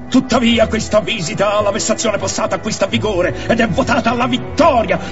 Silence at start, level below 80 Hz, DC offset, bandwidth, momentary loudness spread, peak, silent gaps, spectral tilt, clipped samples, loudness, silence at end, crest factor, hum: 0 s; -36 dBFS; 2%; 8 kHz; 5 LU; 0 dBFS; none; -4.5 dB/octave; under 0.1%; -15 LUFS; 0 s; 16 dB; none